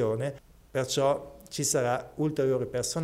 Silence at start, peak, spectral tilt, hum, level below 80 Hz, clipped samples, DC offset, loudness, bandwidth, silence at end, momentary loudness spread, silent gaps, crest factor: 0 s; -14 dBFS; -4.5 dB/octave; none; -58 dBFS; under 0.1%; under 0.1%; -29 LUFS; 16 kHz; 0 s; 9 LU; none; 16 dB